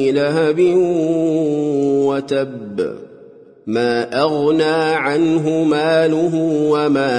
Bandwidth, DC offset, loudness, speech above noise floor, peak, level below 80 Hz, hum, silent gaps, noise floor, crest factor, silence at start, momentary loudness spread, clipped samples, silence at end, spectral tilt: 10 kHz; under 0.1%; -16 LUFS; 27 dB; -4 dBFS; -62 dBFS; none; none; -42 dBFS; 12 dB; 0 s; 9 LU; under 0.1%; 0 s; -6.5 dB/octave